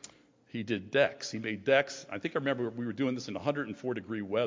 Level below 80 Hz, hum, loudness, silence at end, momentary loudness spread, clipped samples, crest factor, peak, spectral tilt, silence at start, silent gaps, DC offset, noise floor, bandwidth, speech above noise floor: -70 dBFS; none; -32 LUFS; 0 s; 10 LU; under 0.1%; 20 dB; -12 dBFS; -5 dB/octave; 0.05 s; none; under 0.1%; -55 dBFS; 7.6 kHz; 23 dB